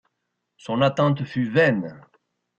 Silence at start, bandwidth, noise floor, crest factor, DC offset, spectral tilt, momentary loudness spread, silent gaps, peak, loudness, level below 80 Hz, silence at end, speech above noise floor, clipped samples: 0.65 s; 8.4 kHz; -78 dBFS; 16 dB; under 0.1%; -7.5 dB/octave; 14 LU; none; -8 dBFS; -22 LUFS; -62 dBFS; 0.6 s; 57 dB; under 0.1%